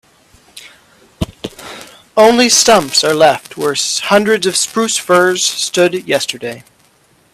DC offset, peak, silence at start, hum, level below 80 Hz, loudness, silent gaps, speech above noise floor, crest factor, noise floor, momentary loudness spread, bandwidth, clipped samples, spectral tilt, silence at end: under 0.1%; 0 dBFS; 0.55 s; none; -46 dBFS; -11 LUFS; none; 40 dB; 14 dB; -52 dBFS; 19 LU; 16 kHz; under 0.1%; -2.5 dB/octave; 0.7 s